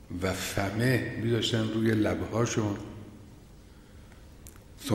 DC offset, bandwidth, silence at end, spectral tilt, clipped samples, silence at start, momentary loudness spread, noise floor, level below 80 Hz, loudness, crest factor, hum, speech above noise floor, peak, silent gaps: under 0.1%; 16.5 kHz; 0 s; -5.5 dB/octave; under 0.1%; 0 s; 23 LU; -51 dBFS; -52 dBFS; -29 LUFS; 18 dB; none; 23 dB; -12 dBFS; none